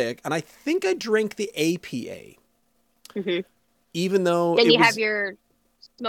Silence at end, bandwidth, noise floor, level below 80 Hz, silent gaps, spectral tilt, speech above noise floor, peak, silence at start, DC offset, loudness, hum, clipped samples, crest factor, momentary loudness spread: 0 s; 17.5 kHz; -69 dBFS; -70 dBFS; none; -4.5 dB/octave; 46 dB; -2 dBFS; 0 s; under 0.1%; -23 LUFS; none; under 0.1%; 22 dB; 17 LU